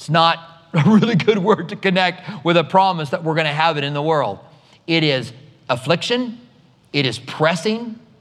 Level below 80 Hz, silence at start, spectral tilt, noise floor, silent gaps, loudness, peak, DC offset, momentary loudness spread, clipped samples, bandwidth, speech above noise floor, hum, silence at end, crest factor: -66 dBFS; 0 s; -6 dB/octave; -49 dBFS; none; -18 LUFS; 0 dBFS; under 0.1%; 11 LU; under 0.1%; 12 kHz; 31 dB; none; 0.25 s; 18 dB